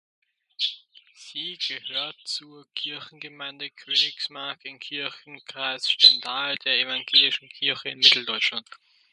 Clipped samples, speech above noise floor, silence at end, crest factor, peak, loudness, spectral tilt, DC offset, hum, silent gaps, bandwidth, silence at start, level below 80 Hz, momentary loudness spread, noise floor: under 0.1%; 26 dB; 0.35 s; 26 dB; 0 dBFS; -22 LUFS; -0.5 dB/octave; under 0.1%; none; none; 11.5 kHz; 0.6 s; -84 dBFS; 20 LU; -52 dBFS